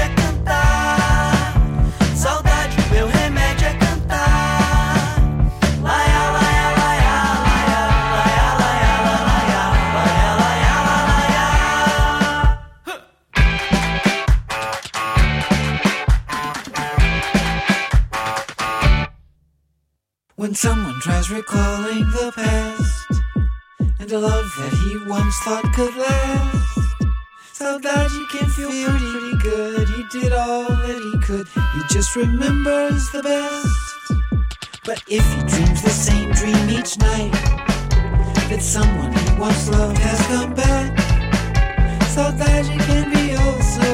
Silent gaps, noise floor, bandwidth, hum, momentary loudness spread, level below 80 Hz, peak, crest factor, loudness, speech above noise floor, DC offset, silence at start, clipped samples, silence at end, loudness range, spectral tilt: none; -73 dBFS; 15.5 kHz; none; 7 LU; -20 dBFS; -4 dBFS; 12 dB; -18 LUFS; 56 dB; under 0.1%; 0 s; under 0.1%; 0 s; 5 LU; -5 dB/octave